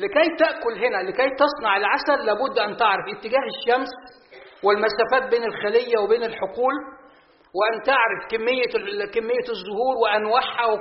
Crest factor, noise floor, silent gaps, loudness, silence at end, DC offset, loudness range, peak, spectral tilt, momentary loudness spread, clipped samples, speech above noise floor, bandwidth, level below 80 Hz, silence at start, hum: 18 dB; -53 dBFS; none; -22 LUFS; 0 s; under 0.1%; 2 LU; -4 dBFS; -0.5 dB/octave; 6 LU; under 0.1%; 32 dB; 5.8 kHz; -60 dBFS; 0 s; none